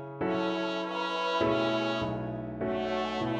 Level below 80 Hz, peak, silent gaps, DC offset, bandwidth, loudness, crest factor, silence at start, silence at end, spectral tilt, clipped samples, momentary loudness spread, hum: -56 dBFS; -16 dBFS; none; under 0.1%; 8.8 kHz; -31 LUFS; 16 dB; 0 s; 0 s; -6 dB/octave; under 0.1%; 6 LU; none